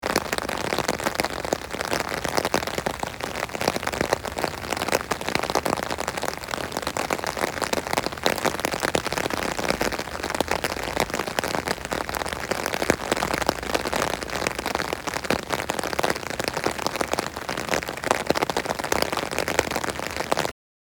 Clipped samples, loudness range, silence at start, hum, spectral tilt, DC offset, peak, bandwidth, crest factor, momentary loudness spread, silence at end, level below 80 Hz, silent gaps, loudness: under 0.1%; 1 LU; 0 s; none; -3 dB/octave; under 0.1%; -2 dBFS; over 20 kHz; 24 dB; 4 LU; 0.45 s; -46 dBFS; none; -26 LUFS